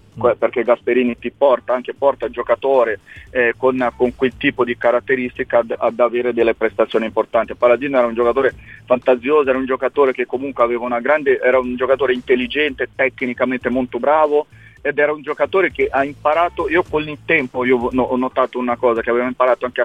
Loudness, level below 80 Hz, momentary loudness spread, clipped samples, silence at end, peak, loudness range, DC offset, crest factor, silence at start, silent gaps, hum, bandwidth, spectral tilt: -17 LUFS; -48 dBFS; 5 LU; under 0.1%; 0 s; -2 dBFS; 1 LU; 0.1%; 16 dB; 0.15 s; none; none; 8 kHz; -7 dB/octave